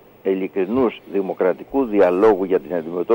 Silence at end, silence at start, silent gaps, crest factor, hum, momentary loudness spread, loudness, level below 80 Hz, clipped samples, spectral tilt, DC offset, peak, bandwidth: 0 s; 0.25 s; none; 14 dB; none; 9 LU; -19 LUFS; -54 dBFS; under 0.1%; -8.5 dB/octave; under 0.1%; -6 dBFS; 16.5 kHz